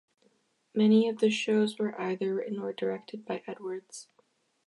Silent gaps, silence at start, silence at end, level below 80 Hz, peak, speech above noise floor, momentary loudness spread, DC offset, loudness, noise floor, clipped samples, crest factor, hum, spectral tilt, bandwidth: none; 0.75 s; 0.65 s; -82 dBFS; -14 dBFS; 41 dB; 15 LU; under 0.1%; -29 LUFS; -70 dBFS; under 0.1%; 18 dB; none; -5.5 dB/octave; 11.5 kHz